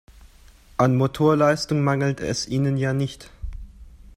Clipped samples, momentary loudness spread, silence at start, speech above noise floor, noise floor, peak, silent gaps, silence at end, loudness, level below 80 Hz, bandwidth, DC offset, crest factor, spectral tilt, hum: under 0.1%; 20 LU; 0.8 s; 29 dB; -50 dBFS; -4 dBFS; none; 0.2 s; -22 LUFS; -42 dBFS; 14.5 kHz; under 0.1%; 18 dB; -6.5 dB/octave; none